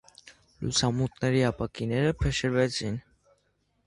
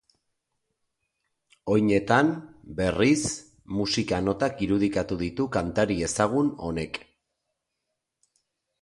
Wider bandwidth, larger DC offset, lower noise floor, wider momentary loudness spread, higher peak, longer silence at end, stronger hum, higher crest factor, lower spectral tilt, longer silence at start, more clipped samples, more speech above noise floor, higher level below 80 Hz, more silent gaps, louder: about the same, 11.5 kHz vs 11.5 kHz; neither; second, -72 dBFS vs -82 dBFS; second, 8 LU vs 12 LU; second, -10 dBFS vs -6 dBFS; second, 0.85 s vs 1.85 s; neither; about the same, 18 dB vs 20 dB; about the same, -5 dB/octave vs -5 dB/octave; second, 0.25 s vs 1.65 s; neither; second, 45 dB vs 57 dB; first, -44 dBFS vs -50 dBFS; neither; second, -28 LUFS vs -25 LUFS